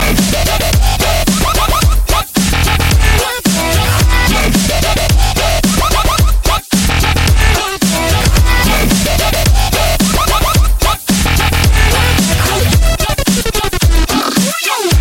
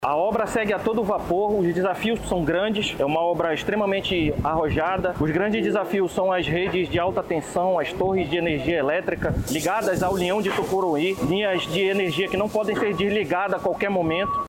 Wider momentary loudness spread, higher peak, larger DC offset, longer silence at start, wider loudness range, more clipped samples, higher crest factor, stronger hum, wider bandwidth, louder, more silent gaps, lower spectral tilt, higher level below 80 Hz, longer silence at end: about the same, 2 LU vs 2 LU; first, 0 dBFS vs -12 dBFS; neither; about the same, 0 s vs 0 s; about the same, 1 LU vs 1 LU; neither; about the same, 10 dB vs 12 dB; neither; about the same, 16.5 kHz vs 17 kHz; first, -11 LUFS vs -23 LUFS; neither; second, -4 dB/octave vs -5.5 dB/octave; first, -14 dBFS vs -42 dBFS; about the same, 0 s vs 0 s